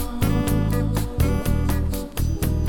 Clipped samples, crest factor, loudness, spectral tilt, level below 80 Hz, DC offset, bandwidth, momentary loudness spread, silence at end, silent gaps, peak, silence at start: under 0.1%; 14 dB; -23 LUFS; -6.5 dB/octave; -26 dBFS; under 0.1%; 19.5 kHz; 5 LU; 0 s; none; -8 dBFS; 0 s